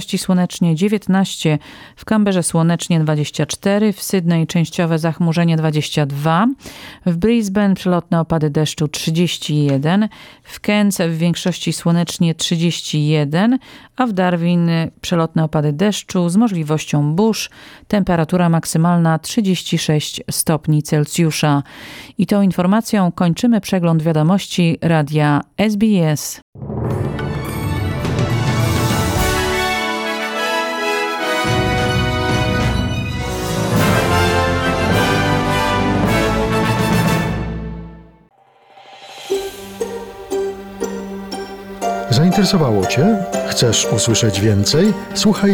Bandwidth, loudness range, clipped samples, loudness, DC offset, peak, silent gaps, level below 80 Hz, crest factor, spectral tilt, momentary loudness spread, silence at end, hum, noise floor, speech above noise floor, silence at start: 18 kHz; 3 LU; under 0.1%; -17 LUFS; under 0.1%; -2 dBFS; 26.42-26.53 s; -36 dBFS; 14 dB; -5.5 dB/octave; 8 LU; 0 s; none; -47 dBFS; 31 dB; 0 s